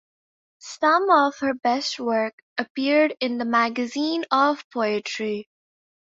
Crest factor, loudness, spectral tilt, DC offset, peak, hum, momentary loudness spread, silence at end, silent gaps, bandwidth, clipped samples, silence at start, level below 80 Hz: 18 dB; -22 LUFS; -3.5 dB/octave; under 0.1%; -4 dBFS; none; 11 LU; 0.75 s; 2.33-2.56 s, 2.70-2.75 s, 4.64-4.71 s; 7.8 kHz; under 0.1%; 0.65 s; -72 dBFS